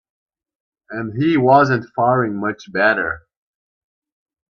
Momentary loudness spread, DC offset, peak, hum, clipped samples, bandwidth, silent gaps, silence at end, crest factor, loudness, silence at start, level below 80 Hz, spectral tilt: 15 LU; under 0.1%; 0 dBFS; none; under 0.1%; 6.8 kHz; none; 1.4 s; 20 dB; -17 LUFS; 0.9 s; -56 dBFS; -7.5 dB/octave